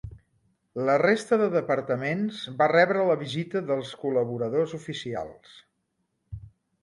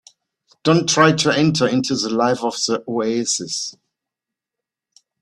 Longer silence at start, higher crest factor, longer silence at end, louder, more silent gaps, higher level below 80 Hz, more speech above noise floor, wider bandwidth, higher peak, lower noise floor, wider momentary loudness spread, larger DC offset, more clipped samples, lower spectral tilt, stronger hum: second, 0.05 s vs 0.65 s; about the same, 20 dB vs 20 dB; second, 0.35 s vs 1.5 s; second, -26 LUFS vs -18 LUFS; neither; about the same, -58 dBFS vs -58 dBFS; second, 51 dB vs 67 dB; about the same, 11.5 kHz vs 12.5 kHz; second, -6 dBFS vs 0 dBFS; second, -76 dBFS vs -85 dBFS; first, 19 LU vs 9 LU; neither; neither; first, -6 dB/octave vs -4 dB/octave; neither